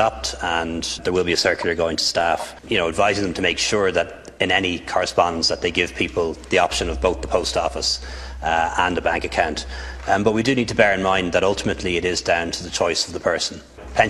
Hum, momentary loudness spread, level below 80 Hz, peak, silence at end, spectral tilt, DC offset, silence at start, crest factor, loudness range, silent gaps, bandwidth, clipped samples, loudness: none; 7 LU; -38 dBFS; 0 dBFS; 0 s; -3.5 dB/octave; under 0.1%; 0 s; 20 dB; 2 LU; none; 13 kHz; under 0.1%; -20 LUFS